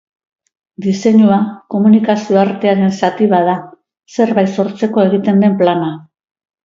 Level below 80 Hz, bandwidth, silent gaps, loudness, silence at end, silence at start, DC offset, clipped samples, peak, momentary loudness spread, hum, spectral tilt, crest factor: -60 dBFS; 7.4 kHz; none; -13 LUFS; 0.65 s; 0.8 s; under 0.1%; under 0.1%; 0 dBFS; 9 LU; none; -7.5 dB/octave; 12 dB